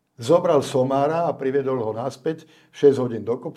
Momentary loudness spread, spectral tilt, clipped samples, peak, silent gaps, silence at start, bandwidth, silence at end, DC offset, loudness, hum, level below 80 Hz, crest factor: 9 LU; -6.5 dB/octave; under 0.1%; -4 dBFS; none; 0.2 s; 12.5 kHz; 0.05 s; under 0.1%; -21 LUFS; none; -68 dBFS; 18 dB